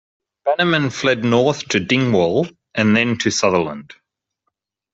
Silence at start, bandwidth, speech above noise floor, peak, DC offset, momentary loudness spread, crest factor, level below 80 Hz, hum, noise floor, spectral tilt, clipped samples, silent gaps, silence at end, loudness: 0.45 s; 8 kHz; 58 dB; -2 dBFS; under 0.1%; 7 LU; 18 dB; -56 dBFS; none; -75 dBFS; -5 dB/octave; under 0.1%; none; 1.1 s; -17 LUFS